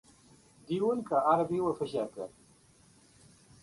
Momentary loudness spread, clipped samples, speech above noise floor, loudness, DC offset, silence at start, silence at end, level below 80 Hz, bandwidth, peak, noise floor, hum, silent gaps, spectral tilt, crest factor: 13 LU; under 0.1%; 32 dB; -31 LUFS; under 0.1%; 0.7 s; 1.35 s; -70 dBFS; 11.5 kHz; -14 dBFS; -62 dBFS; none; none; -7 dB/octave; 20 dB